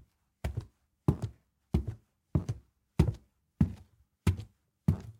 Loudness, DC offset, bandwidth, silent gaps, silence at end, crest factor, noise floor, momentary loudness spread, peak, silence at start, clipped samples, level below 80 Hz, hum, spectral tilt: -35 LUFS; under 0.1%; 16 kHz; none; 0.1 s; 26 dB; -60 dBFS; 14 LU; -10 dBFS; 0.45 s; under 0.1%; -44 dBFS; none; -8 dB/octave